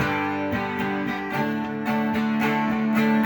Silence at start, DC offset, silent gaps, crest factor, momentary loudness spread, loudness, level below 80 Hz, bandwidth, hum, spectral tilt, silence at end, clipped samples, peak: 0 s; under 0.1%; none; 14 dB; 4 LU; -24 LUFS; -54 dBFS; over 20 kHz; none; -6.5 dB/octave; 0 s; under 0.1%; -10 dBFS